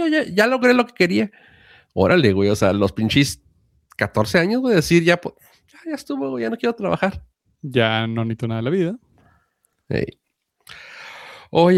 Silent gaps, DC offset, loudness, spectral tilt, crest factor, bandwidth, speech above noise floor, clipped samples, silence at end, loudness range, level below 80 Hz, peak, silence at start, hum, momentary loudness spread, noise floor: none; under 0.1%; -19 LUFS; -6 dB/octave; 18 dB; 16 kHz; 49 dB; under 0.1%; 0 s; 6 LU; -50 dBFS; -2 dBFS; 0 s; none; 21 LU; -67 dBFS